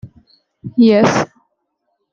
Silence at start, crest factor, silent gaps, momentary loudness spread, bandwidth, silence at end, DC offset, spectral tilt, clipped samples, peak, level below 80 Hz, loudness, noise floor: 0.05 s; 16 dB; none; 16 LU; 7.4 kHz; 0.9 s; under 0.1%; -6 dB/octave; under 0.1%; -2 dBFS; -54 dBFS; -14 LUFS; -70 dBFS